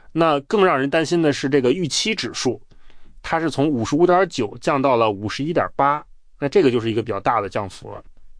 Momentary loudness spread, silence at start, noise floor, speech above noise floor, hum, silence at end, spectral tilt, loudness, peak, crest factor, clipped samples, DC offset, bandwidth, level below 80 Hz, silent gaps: 11 LU; 0.15 s; -39 dBFS; 19 dB; none; 0.05 s; -5 dB/octave; -20 LUFS; -4 dBFS; 16 dB; under 0.1%; under 0.1%; 10.5 kHz; -48 dBFS; none